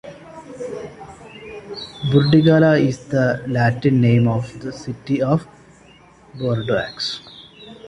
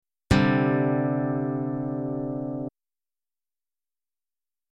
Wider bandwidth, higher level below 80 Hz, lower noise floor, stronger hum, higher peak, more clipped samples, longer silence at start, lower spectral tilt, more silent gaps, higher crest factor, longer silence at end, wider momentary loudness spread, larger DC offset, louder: second, 10.5 kHz vs 12 kHz; second, -50 dBFS vs -44 dBFS; second, -48 dBFS vs under -90 dBFS; neither; first, -2 dBFS vs -6 dBFS; neither; second, 0.05 s vs 0.3 s; about the same, -7.5 dB/octave vs -7.5 dB/octave; neither; about the same, 18 dB vs 22 dB; second, 0 s vs 2.05 s; first, 24 LU vs 10 LU; neither; first, -18 LUFS vs -26 LUFS